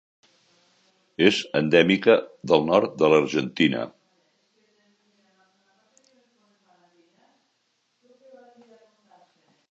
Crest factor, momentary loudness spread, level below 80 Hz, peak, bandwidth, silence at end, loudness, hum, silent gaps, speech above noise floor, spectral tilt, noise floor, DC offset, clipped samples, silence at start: 24 dB; 8 LU; -66 dBFS; -2 dBFS; 8.2 kHz; 5.8 s; -21 LUFS; none; none; 52 dB; -5.5 dB/octave; -72 dBFS; under 0.1%; under 0.1%; 1.2 s